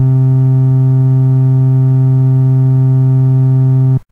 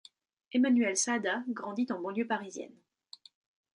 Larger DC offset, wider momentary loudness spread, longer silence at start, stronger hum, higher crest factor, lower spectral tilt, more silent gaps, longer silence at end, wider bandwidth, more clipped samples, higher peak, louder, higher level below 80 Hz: neither; second, 0 LU vs 14 LU; second, 0 s vs 0.55 s; neither; second, 6 dB vs 16 dB; first, -12 dB/octave vs -3 dB/octave; neither; second, 0.1 s vs 1.1 s; second, 1.8 kHz vs 11 kHz; neither; first, -4 dBFS vs -18 dBFS; first, -10 LUFS vs -31 LUFS; first, -44 dBFS vs -84 dBFS